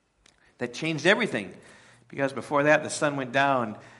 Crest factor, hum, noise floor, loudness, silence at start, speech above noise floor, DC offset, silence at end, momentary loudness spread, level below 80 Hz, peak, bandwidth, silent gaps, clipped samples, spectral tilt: 22 dB; none; -62 dBFS; -25 LUFS; 0.6 s; 36 dB; under 0.1%; 0.1 s; 13 LU; -72 dBFS; -6 dBFS; 11.5 kHz; none; under 0.1%; -4.5 dB/octave